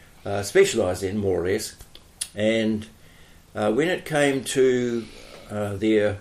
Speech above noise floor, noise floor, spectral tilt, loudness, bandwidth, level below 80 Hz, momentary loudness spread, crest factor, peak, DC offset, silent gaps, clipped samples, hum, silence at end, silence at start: 27 dB; -50 dBFS; -4.5 dB/octave; -23 LUFS; 15 kHz; -54 dBFS; 14 LU; 18 dB; -6 dBFS; under 0.1%; none; under 0.1%; none; 0 s; 0.25 s